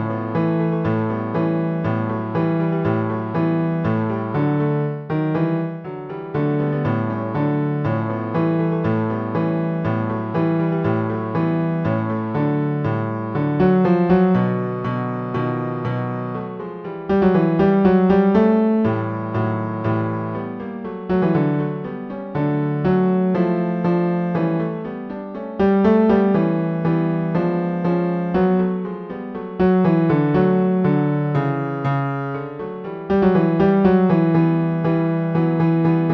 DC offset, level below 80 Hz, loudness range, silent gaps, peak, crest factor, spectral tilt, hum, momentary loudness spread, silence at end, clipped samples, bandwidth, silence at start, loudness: under 0.1%; -48 dBFS; 4 LU; none; -4 dBFS; 16 dB; -11 dB/octave; none; 11 LU; 0 s; under 0.1%; 5.6 kHz; 0 s; -20 LUFS